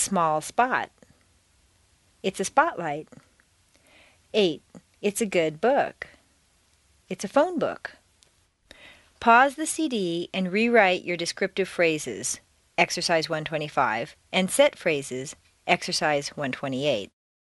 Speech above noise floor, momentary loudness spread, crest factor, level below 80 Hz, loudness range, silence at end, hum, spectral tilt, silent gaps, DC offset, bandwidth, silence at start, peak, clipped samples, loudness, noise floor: 39 dB; 15 LU; 22 dB; -64 dBFS; 6 LU; 0.4 s; none; -3.5 dB/octave; none; under 0.1%; 11.5 kHz; 0 s; -4 dBFS; under 0.1%; -25 LUFS; -64 dBFS